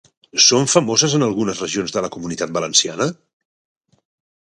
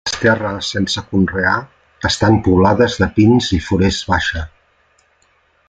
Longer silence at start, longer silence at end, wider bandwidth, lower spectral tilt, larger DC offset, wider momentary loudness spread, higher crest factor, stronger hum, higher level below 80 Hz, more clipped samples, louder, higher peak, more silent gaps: first, 0.35 s vs 0.05 s; about the same, 1.3 s vs 1.2 s; first, 11.5 kHz vs 9.4 kHz; second, -3 dB/octave vs -5.5 dB/octave; neither; first, 12 LU vs 9 LU; first, 20 dB vs 14 dB; neither; second, -58 dBFS vs -38 dBFS; neither; about the same, -17 LUFS vs -15 LUFS; about the same, 0 dBFS vs -2 dBFS; neither